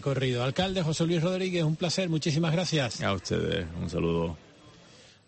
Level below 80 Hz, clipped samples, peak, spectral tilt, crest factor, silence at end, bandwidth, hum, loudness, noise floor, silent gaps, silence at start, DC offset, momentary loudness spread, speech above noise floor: -52 dBFS; under 0.1%; -16 dBFS; -5.5 dB/octave; 14 dB; 0.6 s; 8.8 kHz; none; -28 LUFS; -54 dBFS; none; 0 s; under 0.1%; 4 LU; 27 dB